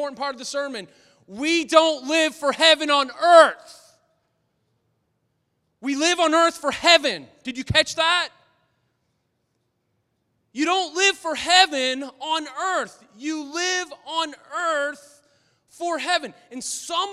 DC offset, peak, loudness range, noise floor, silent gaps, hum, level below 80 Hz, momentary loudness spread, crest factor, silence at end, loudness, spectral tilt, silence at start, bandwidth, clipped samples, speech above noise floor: under 0.1%; 0 dBFS; 8 LU; -73 dBFS; none; none; -56 dBFS; 16 LU; 22 dB; 0 s; -20 LUFS; -2 dB/octave; 0 s; 14 kHz; under 0.1%; 51 dB